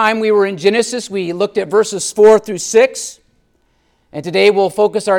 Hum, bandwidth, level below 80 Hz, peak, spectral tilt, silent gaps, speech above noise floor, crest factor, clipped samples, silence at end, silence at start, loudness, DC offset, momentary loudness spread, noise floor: none; 14.5 kHz; -58 dBFS; 0 dBFS; -3.5 dB/octave; none; 46 dB; 14 dB; under 0.1%; 0 s; 0 s; -13 LUFS; under 0.1%; 12 LU; -59 dBFS